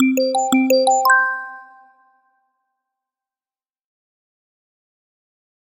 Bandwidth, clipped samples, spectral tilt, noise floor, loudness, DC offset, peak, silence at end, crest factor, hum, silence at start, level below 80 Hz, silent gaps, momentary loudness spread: 16.5 kHz; under 0.1%; -1.5 dB/octave; under -90 dBFS; -16 LUFS; under 0.1%; -2 dBFS; 4 s; 20 dB; none; 0 s; -76 dBFS; none; 12 LU